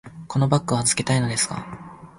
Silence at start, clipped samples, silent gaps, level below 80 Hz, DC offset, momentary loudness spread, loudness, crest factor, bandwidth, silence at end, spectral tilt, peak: 0.05 s; under 0.1%; none; -52 dBFS; under 0.1%; 15 LU; -22 LUFS; 20 dB; 11.5 kHz; 0.1 s; -4 dB/octave; -4 dBFS